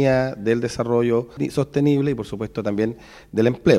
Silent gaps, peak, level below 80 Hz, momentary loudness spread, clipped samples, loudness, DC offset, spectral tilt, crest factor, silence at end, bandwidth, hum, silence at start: none; 0 dBFS; -48 dBFS; 8 LU; under 0.1%; -22 LUFS; under 0.1%; -7 dB/octave; 20 dB; 0 s; 13.5 kHz; none; 0 s